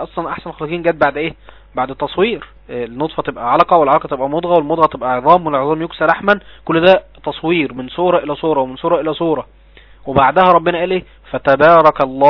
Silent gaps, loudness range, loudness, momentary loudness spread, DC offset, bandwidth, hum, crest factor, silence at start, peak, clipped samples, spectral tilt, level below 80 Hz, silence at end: none; 4 LU; -14 LUFS; 13 LU; under 0.1%; 5.4 kHz; none; 14 dB; 0 s; 0 dBFS; 0.3%; -8 dB/octave; -44 dBFS; 0 s